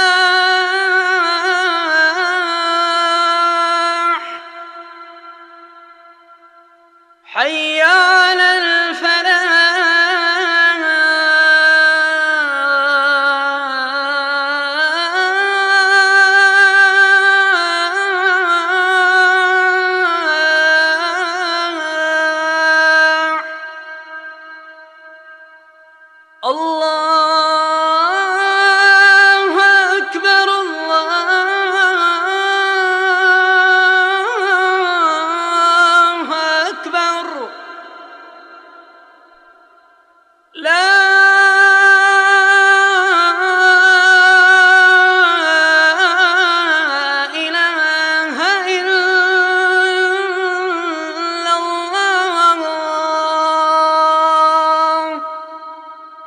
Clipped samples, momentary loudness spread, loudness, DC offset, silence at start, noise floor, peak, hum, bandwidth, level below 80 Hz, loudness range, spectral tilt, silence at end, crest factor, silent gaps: under 0.1%; 10 LU; -12 LUFS; under 0.1%; 0 s; -52 dBFS; 0 dBFS; none; 10.5 kHz; -82 dBFS; 9 LU; 1.5 dB/octave; 0 s; 14 dB; none